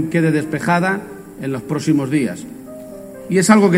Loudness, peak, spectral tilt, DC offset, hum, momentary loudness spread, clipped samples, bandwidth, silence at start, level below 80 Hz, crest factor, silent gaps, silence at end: -18 LUFS; 0 dBFS; -6 dB/octave; under 0.1%; none; 19 LU; under 0.1%; 16.5 kHz; 0 s; -54 dBFS; 18 dB; none; 0 s